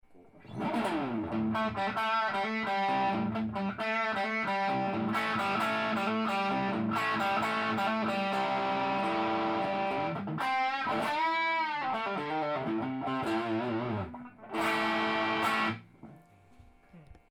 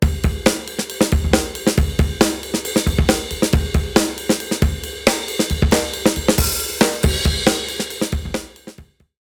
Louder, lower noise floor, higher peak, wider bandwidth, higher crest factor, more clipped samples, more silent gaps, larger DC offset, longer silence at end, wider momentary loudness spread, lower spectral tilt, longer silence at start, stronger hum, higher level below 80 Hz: second, -31 LUFS vs -19 LUFS; first, -58 dBFS vs -42 dBFS; second, -16 dBFS vs 0 dBFS; about the same, over 20 kHz vs over 20 kHz; about the same, 14 dB vs 18 dB; neither; neither; neither; second, 0.2 s vs 0.4 s; about the same, 5 LU vs 6 LU; about the same, -5.5 dB/octave vs -4.5 dB/octave; about the same, 0.1 s vs 0 s; neither; second, -66 dBFS vs -26 dBFS